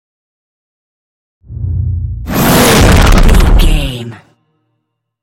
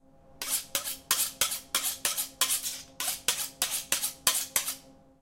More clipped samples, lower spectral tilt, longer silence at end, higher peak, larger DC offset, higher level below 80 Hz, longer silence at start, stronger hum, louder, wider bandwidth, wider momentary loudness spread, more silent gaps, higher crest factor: first, 0.4% vs under 0.1%; first, -5 dB/octave vs 1.5 dB/octave; first, 1.05 s vs 0.25 s; first, 0 dBFS vs -6 dBFS; neither; first, -14 dBFS vs -62 dBFS; first, 1.5 s vs 0.3 s; neither; first, -10 LUFS vs -29 LUFS; about the same, 17.5 kHz vs 17 kHz; first, 17 LU vs 7 LU; neither; second, 10 dB vs 26 dB